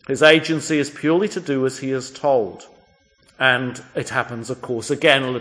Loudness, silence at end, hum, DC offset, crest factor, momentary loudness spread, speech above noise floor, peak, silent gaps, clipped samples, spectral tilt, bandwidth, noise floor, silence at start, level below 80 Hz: -19 LUFS; 0 s; none; under 0.1%; 20 dB; 13 LU; 37 dB; 0 dBFS; none; under 0.1%; -4 dB/octave; 10.5 kHz; -57 dBFS; 0.1 s; -64 dBFS